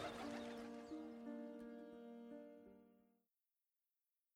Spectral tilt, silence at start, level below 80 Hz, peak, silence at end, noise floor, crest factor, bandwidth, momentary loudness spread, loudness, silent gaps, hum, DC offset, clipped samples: -5 dB/octave; 0 s; -82 dBFS; -38 dBFS; 1.3 s; under -90 dBFS; 16 dB; 16 kHz; 12 LU; -54 LUFS; none; none; under 0.1%; under 0.1%